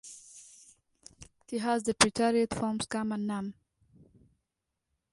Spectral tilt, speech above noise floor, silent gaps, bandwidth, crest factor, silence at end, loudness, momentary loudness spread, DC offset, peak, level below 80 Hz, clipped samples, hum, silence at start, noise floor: -3.5 dB/octave; 56 dB; none; 11.5 kHz; 28 dB; 1.6 s; -30 LUFS; 25 LU; under 0.1%; -4 dBFS; -62 dBFS; under 0.1%; none; 0.05 s; -86 dBFS